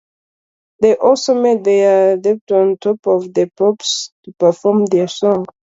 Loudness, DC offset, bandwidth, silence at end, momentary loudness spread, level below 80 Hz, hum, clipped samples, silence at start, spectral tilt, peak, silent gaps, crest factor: -14 LUFS; under 0.1%; 7.8 kHz; 0.2 s; 6 LU; -60 dBFS; none; under 0.1%; 0.8 s; -5 dB/octave; 0 dBFS; 2.41-2.47 s, 2.99-3.03 s, 4.12-4.23 s; 14 dB